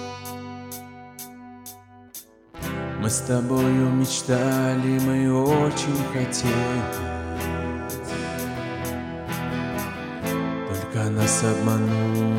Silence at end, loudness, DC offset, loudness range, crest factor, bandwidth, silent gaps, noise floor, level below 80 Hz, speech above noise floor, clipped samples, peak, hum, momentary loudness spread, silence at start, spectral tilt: 0 s; -24 LUFS; under 0.1%; 7 LU; 16 dB; 17 kHz; none; -45 dBFS; -48 dBFS; 23 dB; under 0.1%; -8 dBFS; none; 18 LU; 0 s; -5.5 dB/octave